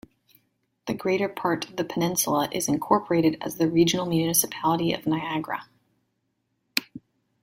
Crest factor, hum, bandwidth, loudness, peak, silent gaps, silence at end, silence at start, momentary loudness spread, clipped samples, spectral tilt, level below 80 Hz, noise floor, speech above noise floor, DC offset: 24 dB; none; 16.5 kHz; -25 LUFS; -2 dBFS; none; 0.45 s; 0.85 s; 8 LU; under 0.1%; -4 dB/octave; -62 dBFS; -75 dBFS; 51 dB; under 0.1%